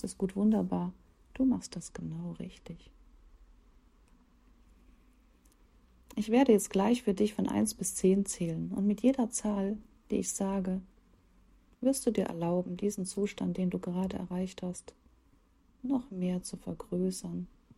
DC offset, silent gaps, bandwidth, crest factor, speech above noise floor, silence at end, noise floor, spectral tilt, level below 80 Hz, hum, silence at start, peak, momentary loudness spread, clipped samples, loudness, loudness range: under 0.1%; none; 15.5 kHz; 20 dB; 34 dB; 0.3 s; -65 dBFS; -6 dB/octave; -60 dBFS; none; 0.05 s; -12 dBFS; 14 LU; under 0.1%; -32 LUFS; 9 LU